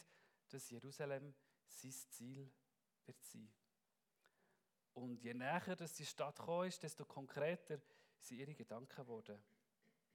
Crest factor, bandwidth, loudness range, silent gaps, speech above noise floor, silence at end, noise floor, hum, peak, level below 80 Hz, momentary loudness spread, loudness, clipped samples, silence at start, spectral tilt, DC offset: 24 dB; 19 kHz; 12 LU; none; 40 dB; 0.7 s; -90 dBFS; none; -28 dBFS; under -90 dBFS; 17 LU; -50 LUFS; under 0.1%; 0 s; -4.5 dB/octave; under 0.1%